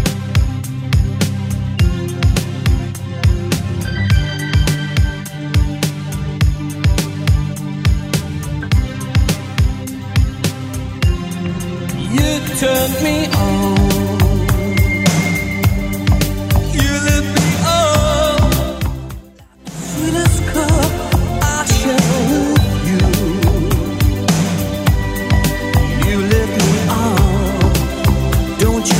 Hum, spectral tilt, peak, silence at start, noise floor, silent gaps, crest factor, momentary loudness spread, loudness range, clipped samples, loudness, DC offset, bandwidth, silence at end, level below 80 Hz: none; -5.5 dB/octave; 0 dBFS; 0 s; -38 dBFS; none; 14 dB; 7 LU; 4 LU; under 0.1%; -16 LUFS; under 0.1%; 16.5 kHz; 0 s; -22 dBFS